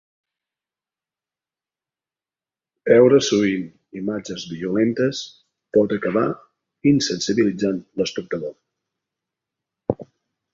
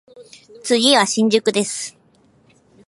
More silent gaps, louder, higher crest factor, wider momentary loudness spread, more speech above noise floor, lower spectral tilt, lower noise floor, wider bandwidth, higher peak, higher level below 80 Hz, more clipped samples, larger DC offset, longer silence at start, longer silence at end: neither; second, -20 LUFS vs -16 LUFS; about the same, 20 dB vs 18 dB; about the same, 16 LU vs 16 LU; first, over 71 dB vs 38 dB; first, -5 dB/octave vs -2.5 dB/octave; first, under -90 dBFS vs -55 dBFS; second, 7.8 kHz vs 11.5 kHz; about the same, -2 dBFS vs -2 dBFS; first, -58 dBFS vs -70 dBFS; neither; neither; first, 2.85 s vs 0.15 s; second, 0.5 s vs 0.95 s